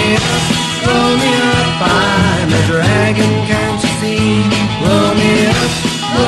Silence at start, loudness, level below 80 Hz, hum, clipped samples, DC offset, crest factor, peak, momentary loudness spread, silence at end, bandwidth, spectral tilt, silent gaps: 0 s; -12 LUFS; -34 dBFS; none; under 0.1%; under 0.1%; 12 dB; 0 dBFS; 4 LU; 0 s; 13 kHz; -4.5 dB/octave; none